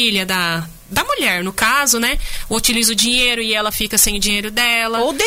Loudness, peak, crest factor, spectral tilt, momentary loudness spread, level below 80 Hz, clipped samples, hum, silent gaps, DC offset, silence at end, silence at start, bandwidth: -15 LUFS; -2 dBFS; 16 dB; -1.5 dB/octave; 7 LU; -32 dBFS; under 0.1%; none; none; under 0.1%; 0 s; 0 s; 16.5 kHz